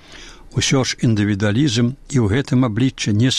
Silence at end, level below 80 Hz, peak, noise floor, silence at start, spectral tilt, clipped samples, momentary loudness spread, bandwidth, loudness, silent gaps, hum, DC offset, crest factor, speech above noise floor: 0 s; -42 dBFS; -6 dBFS; -39 dBFS; 0.1 s; -5 dB/octave; under 0.1%; 3 LU; 12 kHz; -18 LUFS; none; none; 0.4%; 10 dB; 23 dB